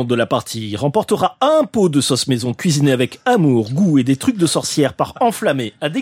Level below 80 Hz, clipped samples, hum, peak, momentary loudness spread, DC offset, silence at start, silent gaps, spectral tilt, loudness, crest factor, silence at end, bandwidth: -56 dBFS; under 0.1%; none; -2 dBFS; 5 LU; under 0.1%; 0 s; none; -5 dB/octave; -16 LUFS; 14 dB; 0 s; 16.5 kHz